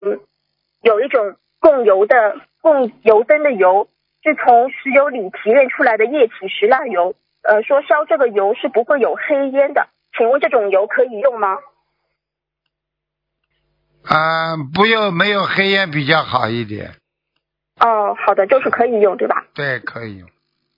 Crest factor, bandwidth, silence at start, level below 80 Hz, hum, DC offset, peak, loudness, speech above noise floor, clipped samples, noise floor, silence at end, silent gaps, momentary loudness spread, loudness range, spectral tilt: 16 dB; 6 kHz; 0 s; -62 dBFS; none; under 0.1%; 0 dBFS; -15 LUFS; 67 dB; under 0.1%; -81 dBFS; 0.6 s; none; 9 LU; 5 LU; -7.5 dB/octave